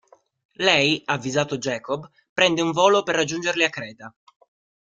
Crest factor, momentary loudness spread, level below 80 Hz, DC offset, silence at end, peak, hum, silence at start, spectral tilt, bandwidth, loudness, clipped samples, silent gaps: 22 dB; 13 LU; -64 dBFS; under 0.1%; 0.7 s; -2 dBFS; none; 0.6 s; -3.5 dB/octave; 9.4 kHz; -21 LUFS; under 0.1%; 2.29-2.36 s